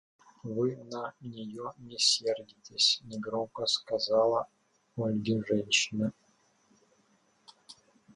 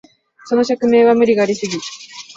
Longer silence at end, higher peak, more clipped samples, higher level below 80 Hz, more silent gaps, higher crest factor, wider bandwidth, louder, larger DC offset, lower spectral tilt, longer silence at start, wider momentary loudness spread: first, 0.4 s vs 0.05 s; second, -12 dBFS vs -2 dBFS; neither; second, -70 dBFS vs -60 dBFS; neither; first, 22 dB vs 14 dB; first, 11.5 kHz vs 8 kHz; second, -30 LUFS vs -15 LUFS; neither; second, -3 dB/octave vs -4.5 dB/octave; about the same, 0.45 s vs 0.45 s; about the same, 16 LU vs 15 LU